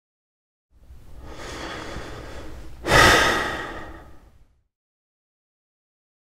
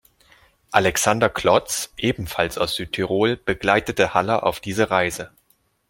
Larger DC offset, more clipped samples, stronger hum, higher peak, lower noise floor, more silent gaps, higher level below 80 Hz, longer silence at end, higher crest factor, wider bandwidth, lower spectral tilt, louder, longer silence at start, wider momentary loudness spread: neither; neither; neither; about the same, 0 dBFS vs -2 dBFS; second, -55 dBFS vs -64 dBFS; neither; first, -38 dBFS vs -48 dBFS; first, 1.95 s vs 0.65 s; first, 26 dB vs 20 dB; about the same, 16 kHz vs 17 kHz; about the same, -3 dB/octave vs -3.5 dB/octave; first, -17 LUFS vs -21 LUFS; first, 0.9 s vs 0.7 s; first, 26 LU vs 6 LU